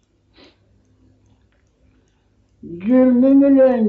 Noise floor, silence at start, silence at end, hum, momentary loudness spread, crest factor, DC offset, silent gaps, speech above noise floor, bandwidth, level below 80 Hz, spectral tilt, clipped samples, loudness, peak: -59 dBFS; 2.65 s; 0 s; none; 16 LU; 14 dB; under 0.1%; none; 47 dB; 4.3 kHz; -56 dBFS; -8 dB/octave; under 0.1%; -13 LUFS; -4 dBFS